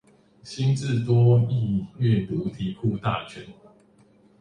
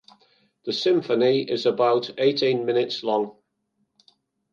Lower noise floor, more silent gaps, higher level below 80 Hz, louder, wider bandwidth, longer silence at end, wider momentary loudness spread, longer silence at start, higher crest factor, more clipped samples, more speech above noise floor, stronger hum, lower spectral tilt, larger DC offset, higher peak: second, -57 dBFS vs -73 dBFS; neither; first, -52 dBFS vs -76 dBFS; about the same, -24 LUFS vs -23 LUFS; first, 9.6 kHz vs 7.2 kHz; second, 0.9 s vs 1.2 s; first, 12 LU vs 6 LU; second, 0.45 s vs 0.65 s; about the same, 16 dB vs 16 dB; neither; second, 34 dB vs 52 dB; neither; first, -8 dB/octave vs -5.5 dB/octave; neither; about the same, -8 dBFS vs -8 dBFS